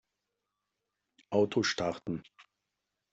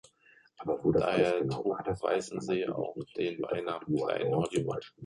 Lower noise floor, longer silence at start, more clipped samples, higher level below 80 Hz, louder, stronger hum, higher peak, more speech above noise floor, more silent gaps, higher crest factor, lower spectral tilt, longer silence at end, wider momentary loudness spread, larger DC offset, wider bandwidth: first, -86 dBFS vs -63 dBFS; first, 1.3 s vs 0.6 s; neither; second, -70 dBFS vs -60 dBFS; about the same, -32 LUFS vs -32 LUFS; neither; about the same, -14 dBFS vs -14 dBFS; first, 54 dB vs 32 dB; neither; about the same, 22 dB vs 18 dB; second, -4.5 dB/octave vs -6.5 dB/octave; first, 0.7 s vs 0 s; first, 11 LU vs 8 LU; neither; second, 8 kHz vs 11.5 kHz